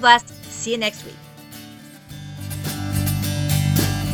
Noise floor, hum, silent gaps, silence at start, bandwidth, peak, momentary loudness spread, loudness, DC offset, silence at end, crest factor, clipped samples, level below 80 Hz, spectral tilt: -41 dBFS; none; none; 0 s; 17.5 kHz; 0 dBFS; 21 LU; -21 LUFS; under 0.1%; 0 s; 22 dB; under 0.1%; -40 dBFS; -4 dB/octave